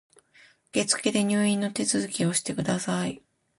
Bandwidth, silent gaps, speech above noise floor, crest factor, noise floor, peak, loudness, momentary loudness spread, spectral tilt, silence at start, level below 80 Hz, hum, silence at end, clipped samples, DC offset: 11.5 kHz; none; 32 dB; 18 dB; -58 dBFS; -8 dBFS; -26 LUFS; 7 LU; -4 dB/octave; 0.75 s; -64 dBFS; none; 0.4 s; under 0.1%; under 0.1%